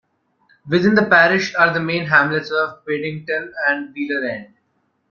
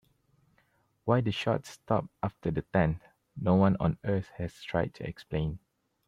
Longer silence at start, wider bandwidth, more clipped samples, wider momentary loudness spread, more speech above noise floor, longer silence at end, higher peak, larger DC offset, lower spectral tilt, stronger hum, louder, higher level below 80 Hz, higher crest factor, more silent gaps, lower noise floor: second, 0.65 s vs 1.05 s; second, 7 kHz vs 11.5 kHz; neither; about the same, 12 LU vs 13 LU; first, 49 dB vs 41 dB; first, 0.65 s vs 0.5 s; first, -2 dBFS vs -10 dBFS; neither; second, -6 dB/octave vs -8 dB/octave; neither; first, -17 LUFS vs -31 LUFS; second, -60 dBFS vs -52 dBFS; about the same, 18 dB vs 20 dB; neither; about the same, -67 dBFS vs -70 dBFS